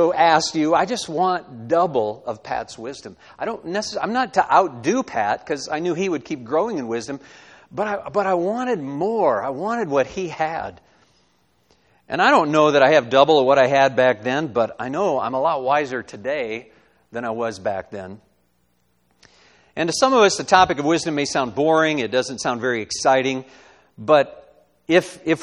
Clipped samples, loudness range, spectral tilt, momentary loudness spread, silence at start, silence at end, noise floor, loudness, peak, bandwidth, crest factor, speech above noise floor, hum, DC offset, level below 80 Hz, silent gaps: under 0.1%; 8 LU; -4 dB/octave; 14 LU; 0 s; 0 s; -66 dBFS; -20 LUFS; 0 dBFS; 12 kHz; 20 dB; 46 dB; none; under 0.1%; -58 dBFS; none